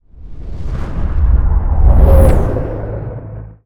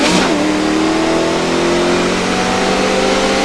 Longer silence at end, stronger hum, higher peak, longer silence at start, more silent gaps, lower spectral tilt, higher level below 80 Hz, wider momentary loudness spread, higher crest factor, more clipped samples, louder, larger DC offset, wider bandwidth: about the same, 0.1 s vs 0 s; neither; about the same, 0 dBFS vs 0 dBFS; first, 0.2 s vs 0 s; neither; first, -9 dB/octave vs -4 dB/octave; first, -14 dBFS vs -36 dBFS; first, 19 LU vs 2 LU; about the same, 12 dB vs 14 dB; neither; about the same, -14 LUFS vs -14 LUFS; neither; first, 13 kHz vs 11 kHz